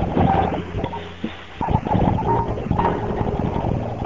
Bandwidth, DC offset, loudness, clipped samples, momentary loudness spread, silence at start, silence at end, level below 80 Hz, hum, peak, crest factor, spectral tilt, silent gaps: 7.6 kHz; 0.8%; -22 LUFS; under 0.1%; 11 LU; 0 s; 0 s; -32 dBFS; none; -4 dBFS; 18 dB; -9 dB/octave; none